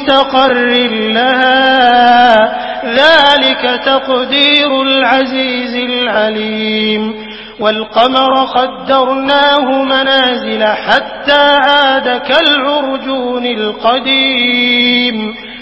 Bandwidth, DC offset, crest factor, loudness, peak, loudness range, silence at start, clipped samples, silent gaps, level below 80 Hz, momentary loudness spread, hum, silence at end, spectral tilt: 8 kHz; under 0.1%; 10 dB; -10 LUFS; 0 dBFS; 4 LU; 0 s; 0.3%; none; -48 dBFS; 8 LU; none; 0 s; -4.5 dB/octave